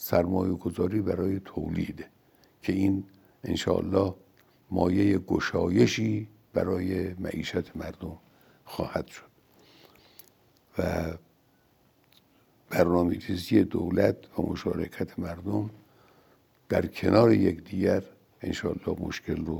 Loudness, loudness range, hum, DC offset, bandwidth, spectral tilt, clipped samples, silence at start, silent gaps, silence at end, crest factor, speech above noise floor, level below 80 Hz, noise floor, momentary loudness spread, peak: -28 LUFS; 10 LU; none; under 0.1%; 19.5 kHz; -7 dB/octave; under 0.1%; 0 s; none; 0 s; 22 dB; 38 dB; -56 dBFS; -65 dBFS; 14 LU; -6 dBFS